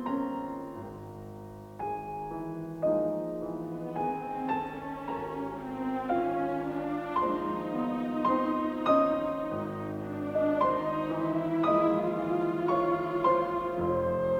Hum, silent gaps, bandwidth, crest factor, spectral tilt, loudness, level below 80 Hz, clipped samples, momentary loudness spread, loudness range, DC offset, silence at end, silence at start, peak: none; none; 16.5 kHz; 18 dB; -8 dB/octave; -31 LUFS; -60 dBFS; under 0.1%; 11 LU; 6 LU; under 0.1%; 0 s; 0 s; -14 dBFS